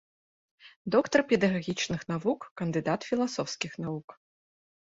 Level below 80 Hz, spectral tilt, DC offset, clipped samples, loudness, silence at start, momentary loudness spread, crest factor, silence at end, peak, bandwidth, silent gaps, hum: -64 dBFS; -5 dB/octave; under 0.1%; under 0.1%; -29 LUFS; 0.65 s; 11 LU; 22 dB; 0.75 s; -8 dBFS; 8 kHz; 0.76-0.85 s, 2.51-2.56 s, 4.04-4.08 s; none